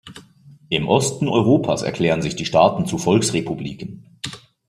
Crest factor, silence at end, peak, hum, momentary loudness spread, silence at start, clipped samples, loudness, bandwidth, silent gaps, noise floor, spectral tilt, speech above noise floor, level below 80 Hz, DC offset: 18 dB; 0.3 s; -2 dBFS; none; 16 LU; 0.05 s; under 0.1%; -19 LUFS; 14.5 kHz; none; -48 dBFS; -5 dB/octave; 29 dB; -52 dBFS; under 0.1%